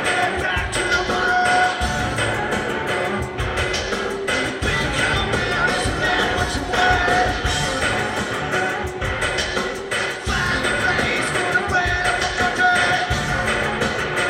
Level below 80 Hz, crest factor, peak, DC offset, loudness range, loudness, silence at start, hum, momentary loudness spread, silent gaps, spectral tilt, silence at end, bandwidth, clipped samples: -34 dBFS; 16 dB; -4 dBFS; under 0.1%; 3 LU; -20 LUFS; 0 s; none; 6 LU; none; -3.5 dB/octave; 0 s; 16 kHz; under 0.1%